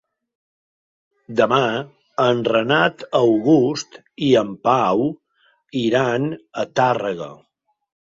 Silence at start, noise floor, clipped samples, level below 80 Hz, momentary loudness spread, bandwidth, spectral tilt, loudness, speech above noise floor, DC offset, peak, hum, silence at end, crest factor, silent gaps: 1.3 s; -62 dBFS; under 0.1%; -62 dBFS; 13 LU; 7.8 kHz; -5.5 dB/octave; -19 LUFS; 43 dB; under 0.1%; -2 dBFS; none; 0.85 s; 18 dB; none